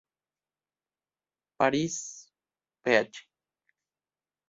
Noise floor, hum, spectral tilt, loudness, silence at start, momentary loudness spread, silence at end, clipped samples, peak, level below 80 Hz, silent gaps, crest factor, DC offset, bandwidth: under -90 dBFS; 50 Hz at -70 dBFS; -4 dB/octave; -28 LUFS; 1.6 s; 20 LU; 1.3 s; under 0.1%; -8 dBFS; -72 dBFS; none; 26 dB; under 0.1%; 8 kHz